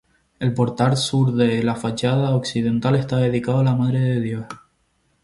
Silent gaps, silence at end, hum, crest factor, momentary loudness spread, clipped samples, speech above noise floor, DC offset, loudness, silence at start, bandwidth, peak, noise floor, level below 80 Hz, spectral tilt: none; 0.65 s; none; 16 dB; 7 LU; under 0.1%; 46 dB; under 0.1%; -20 LUFS; 0.4 s; 11.5 kHz; -4 dBFS; -65 dBFS; -52 dBFS; -6.5 dB/octave